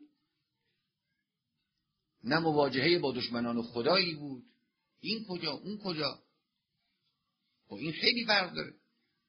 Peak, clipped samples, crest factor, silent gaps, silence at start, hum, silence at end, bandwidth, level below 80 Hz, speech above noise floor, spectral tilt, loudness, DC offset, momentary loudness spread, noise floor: -12 dBFS; under 0.1%; 24 dB; none; 0 s; none; 0.55 s; 6.2 kHz; -72 dBFS; 53 dB; -2.5 dB/octave; -31 LUFS; under 0.1%; 16 LU; -85 dBFS